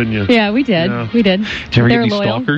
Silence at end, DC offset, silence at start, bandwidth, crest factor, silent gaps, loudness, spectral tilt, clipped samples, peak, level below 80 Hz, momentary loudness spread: 0 s; under 0.1%; 0 s; 7.6 kHz; 12 dB; none; -14 LUFS; -7 dB/octave; under 0.1%; -2 dBFS; -40 dBFS; 4 LU